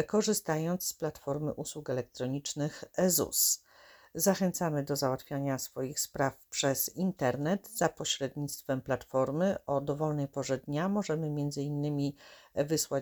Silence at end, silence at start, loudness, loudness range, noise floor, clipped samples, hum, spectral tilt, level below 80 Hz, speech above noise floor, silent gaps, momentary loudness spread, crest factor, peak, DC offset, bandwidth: 0 s; 0 s; -32 LUFS; 2 LU; -59 dBFS; under 0.1%; none; -4.5 dB/octave; -64 dBFS; 27 dB; none; 8 LU; 20 dB; -12 dBFS; under 0.1%; over 20 kHz